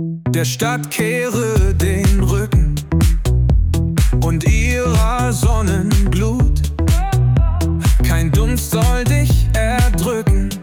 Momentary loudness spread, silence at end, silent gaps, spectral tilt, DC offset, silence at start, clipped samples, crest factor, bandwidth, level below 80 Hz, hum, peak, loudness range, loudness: 3 LU; 0 s; none; -6 dB/octave; under 0.1%; 0 s; under 0.1%; 10 dB; 18 kHz; -18 dBFS; none; -4 dBFS; 1 LU; -16 LUFS